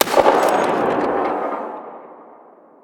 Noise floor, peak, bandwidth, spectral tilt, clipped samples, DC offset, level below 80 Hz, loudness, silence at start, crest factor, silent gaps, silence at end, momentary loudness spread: -46 dBFS; 0 dBFS; over 20 kHz; -3.5 dB/octave; under 0.1%; under 0.1%; -56 dBFS; -18 LUFS; 0 s; 20 dB; none; 0.5 s; 20 LU